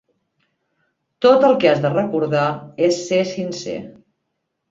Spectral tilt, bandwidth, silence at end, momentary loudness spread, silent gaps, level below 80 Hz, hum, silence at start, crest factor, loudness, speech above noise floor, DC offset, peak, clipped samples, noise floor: -5.5 dB/octave; 7.8 kHz; 0.8 s; 13 LU; none; -62 dBFS; none; 1.2 s; 18 dB; -18 LUFS; 58 dB; under 0.1%; -2 dBFS; under 0.1%; -75 dBFS